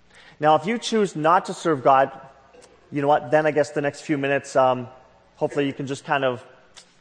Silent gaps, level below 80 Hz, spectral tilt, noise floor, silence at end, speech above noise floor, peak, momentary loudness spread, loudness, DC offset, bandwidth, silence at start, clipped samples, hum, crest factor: none; -68 dBFS; -5.5 dB/octave; -51 dBFS; 0.2 s; 30 dB; -4 dBFS; 9 LU; -22 LUFS; under 0.1%; 9.8 kHz; 0.4 s; under 0.1%; none; 18 dB